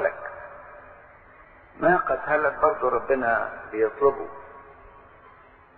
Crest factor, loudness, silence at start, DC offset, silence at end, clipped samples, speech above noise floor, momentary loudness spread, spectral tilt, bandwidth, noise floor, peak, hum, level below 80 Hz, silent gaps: 20 dB; -24 LUFS; 0 s; under 0.1%; 0.8 s; under 0.1%; 28 dB; 22 LU; -5.5 dB/octave; 4.4 kHz; -52 dBFS; -6 dBFS; none; -56 dBFS; none